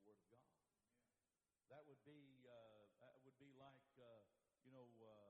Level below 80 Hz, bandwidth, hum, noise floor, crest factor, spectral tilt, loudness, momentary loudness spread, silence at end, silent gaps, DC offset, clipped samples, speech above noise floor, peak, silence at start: under -90 dBFS; 3.9 kHz; none; under -90 dBFS; 18 dB; -4.5 dB/octave; -69 LUFS; 2 LU; 0 s; none; under 0.1%; under 0.1%; over 22 dB; -54 dBFS; 0 s